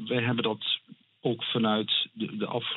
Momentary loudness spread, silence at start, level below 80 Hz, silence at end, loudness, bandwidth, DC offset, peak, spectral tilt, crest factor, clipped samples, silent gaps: 7 LU; 0 s; -76 dBFS; 0 s; -29 LUFS; 4.2 kHz; under 0.1%; -16 dBFS; -9 dB/octave; 14 dB; under 0.1%; none